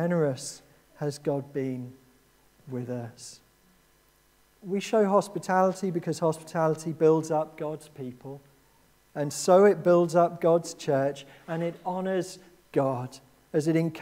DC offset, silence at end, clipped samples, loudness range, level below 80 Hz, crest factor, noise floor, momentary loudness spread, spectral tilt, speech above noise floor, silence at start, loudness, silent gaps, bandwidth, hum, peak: under 0.1%; 0 s; under 0.1%; 11 LU; -70 dBFS; 20 dB; -63 dBFS; 19 LU; -6 dB/octave; 37 dB; 0 s; -27 LUFS; none; 16 kHz; none; -8 dBFS